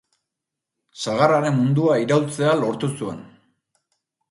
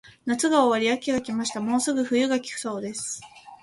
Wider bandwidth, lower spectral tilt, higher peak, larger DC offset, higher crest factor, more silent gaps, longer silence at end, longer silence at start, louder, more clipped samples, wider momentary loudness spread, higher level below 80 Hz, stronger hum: about the same, 11.5 kHz vs 11.5 kHz; first, -6.5 dB/octave vs -3 dB/octave; first, -2 dBFS vs -6 dBFS; neither; about the same, 20 dB vs 18 dB; neither; first, 1.05 s vs 0.05 s; first, 0.95 s vs 0.25 s; first, -20 LUFS vs -25 LUFS; neither; about the same, 13 LU vs 11 LU; about the same, -64 dBFS vs -64 dBFS; neither